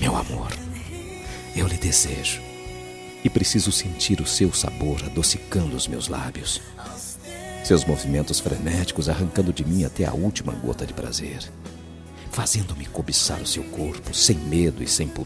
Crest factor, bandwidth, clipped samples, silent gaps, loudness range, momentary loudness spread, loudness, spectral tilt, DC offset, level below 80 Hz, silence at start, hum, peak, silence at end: 22 dB; 14.5 kHz; under 0.1%; none; 4 LU; 16 LU; -23 LUFS; -4 dB/octave; under 0.1%; -38 dBFS; 0 s; none; -4 dBFS; 0 s